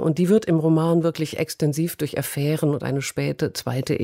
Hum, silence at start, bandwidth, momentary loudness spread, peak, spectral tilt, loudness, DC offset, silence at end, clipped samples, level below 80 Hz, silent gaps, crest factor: none; 0 s; 16 kHz; 7 LU; -8 dBFS; -6.5 dB/octave; -22 LUFS; under 0.1%; 0 s; under 0.1%; -58 dBFS; none; 14 dB